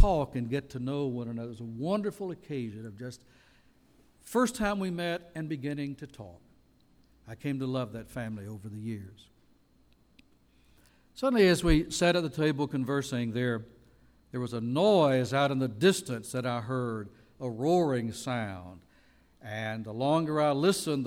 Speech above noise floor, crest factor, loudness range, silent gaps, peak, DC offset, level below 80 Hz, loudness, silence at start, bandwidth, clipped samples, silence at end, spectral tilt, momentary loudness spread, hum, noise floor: 34 dB; 22 dB; 10 LU; none; -8 dBFS; under 0.1%; -46 dBFS; -30 LUFS; 0 s; 16.5 kHz; under 0.1%; 0 s; -5.5 dB/octave; 16 LU; none; -64 dBFS